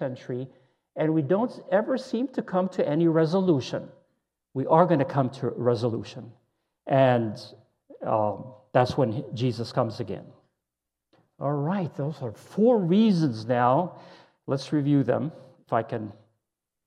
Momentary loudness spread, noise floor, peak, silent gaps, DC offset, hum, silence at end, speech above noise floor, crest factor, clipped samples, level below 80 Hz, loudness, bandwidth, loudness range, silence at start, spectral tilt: 15 LU; -86 dBFS; -4 dBFS; none; under 0.1%; none; 0.75 s; 61 dB; 22 dB; under 0.1%; -68 dBFS; -26 LUFS; 10.5 kHz; 4 LU; 0 s; -8 dB/octave